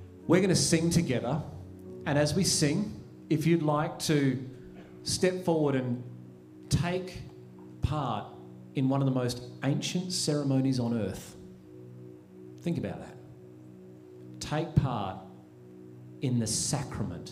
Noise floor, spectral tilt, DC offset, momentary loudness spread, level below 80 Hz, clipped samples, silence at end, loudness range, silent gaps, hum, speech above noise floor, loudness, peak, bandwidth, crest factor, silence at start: -50 dBFS; -5 dB/octave; under 0.1%; 23 LU; -54 dBFS; under 0.1%; 0 s; 8 LU; none; none; 22 dB; -29 LUFS; -10 dBFS; 15.5 kHz; 20 dB; 0 s